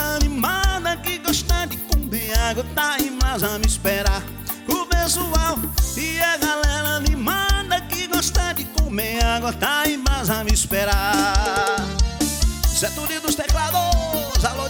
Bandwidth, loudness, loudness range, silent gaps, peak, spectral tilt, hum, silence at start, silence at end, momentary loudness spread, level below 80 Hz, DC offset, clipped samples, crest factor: 19.5 kHz; -21 LUFS; 1 LU; none; -4 dBFS; -3.5 dB/octave; none; 0 s; 0 s; 4 LU; -24 dBFS; under 0.1%; under 0.1%; 16 dB